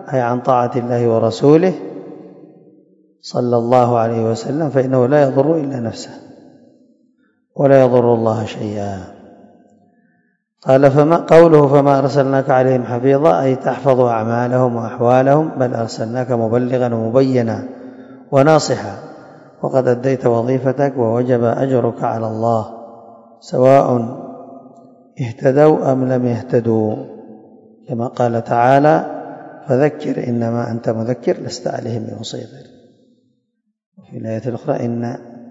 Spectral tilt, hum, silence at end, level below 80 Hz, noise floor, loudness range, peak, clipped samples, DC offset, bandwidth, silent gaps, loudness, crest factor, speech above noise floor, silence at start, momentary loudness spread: -7.5 dB/octave; none; 0 s; -60 dBFS; -69 dBFS; 7 LU; 0 dBFS; 0.2%; under 0.1%; 8 kHz; 33.86-33.92 s; -15 LUFS; 16 dB; 55 dB; 0 s; 16 LU